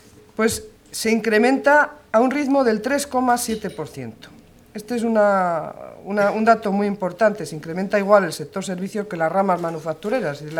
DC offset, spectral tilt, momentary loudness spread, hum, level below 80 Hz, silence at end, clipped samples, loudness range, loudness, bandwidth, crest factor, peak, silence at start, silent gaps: under 0.1%; -5 dB/octave; 14 LU; none; -56 dBFS; 0 s; under 0.1%; 3 LU; -20 LUFS; 18 kHz; 20 dB; 0 dBFS; 0.4 s; none